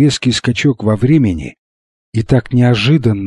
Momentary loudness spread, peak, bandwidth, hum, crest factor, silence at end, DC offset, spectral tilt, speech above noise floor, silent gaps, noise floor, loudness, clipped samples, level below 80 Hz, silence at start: 11 LU; 0 dBFS; 11 kHz; none; 12 dB; 0 s; under 0.1%; -6.5 dB/octave; over 78 dB; 1.59-2.12 s; under -90 dBFS; -13 LUFS; under 0.1%; -36 dBFS; 0 s